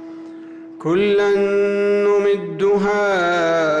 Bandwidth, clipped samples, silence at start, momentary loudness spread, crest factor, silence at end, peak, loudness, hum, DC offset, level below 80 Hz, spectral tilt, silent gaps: 8.6 kHz; under 0.1%; 0 s; 19 LU; 8 dB; 0 s; -10 dBFS; -17 LUFS; none; under 0.1%; -56 dBFS; -6 dB/octave; none